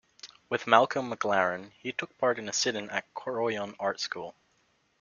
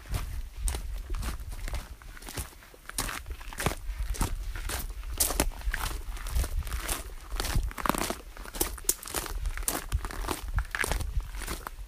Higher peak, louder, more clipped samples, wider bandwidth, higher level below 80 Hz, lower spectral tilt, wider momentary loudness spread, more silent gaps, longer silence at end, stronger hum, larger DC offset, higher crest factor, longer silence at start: about the same, -4 dBFS vs -2 dBFS; first, -29 LUFS vs -34 LUFS; neither; second, 7.4 kHz vs 16 kHz; second, -74 dBFS vs -34 dBFS; about the same, -2.5 dB/octave vs -3 dB/octave; first, 14 LU vs 11 LU; neither; first, 0.7 s vs 0 s; neither; neither; about the same, 28 dB vs 30 dB; first, 0.25 s vs 0 s